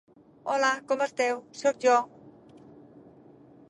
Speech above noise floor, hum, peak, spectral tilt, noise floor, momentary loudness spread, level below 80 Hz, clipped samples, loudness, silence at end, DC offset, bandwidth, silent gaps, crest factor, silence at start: 28 dB; none; -12 dBFS; -2.5 dB/octave; -53 dBFS; 8 LU; -78 dBFS; under 0.1%; -26 LUFS; 1.4 s; under 0.1%; 11 kHz; none; 18 dB; 0.45 s